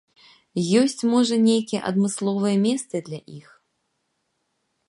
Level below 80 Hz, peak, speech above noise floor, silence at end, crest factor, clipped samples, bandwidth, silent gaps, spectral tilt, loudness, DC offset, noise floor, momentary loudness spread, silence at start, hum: -72 dBFS; -6 dBFS; 53 dB; 1.5 s; 18 dB; under 0.1%; 11.5 kHz; none; -5.5 dB/octave; -22 LUFS; under 0.1%; -74 dBFS; 12 LU; 0.55 s; none